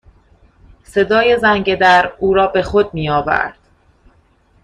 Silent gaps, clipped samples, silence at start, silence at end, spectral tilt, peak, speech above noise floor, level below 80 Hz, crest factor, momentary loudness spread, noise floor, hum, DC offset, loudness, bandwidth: none; under 0.1%; 0.9 s; 1.15 s; -5.5 dB/octave; 0 dBFS; 40 dB; -42 dBFS; 16 dB; 7 LU; -54 dBFS; none; under 0.1%; -14 LUFS; 11 kHz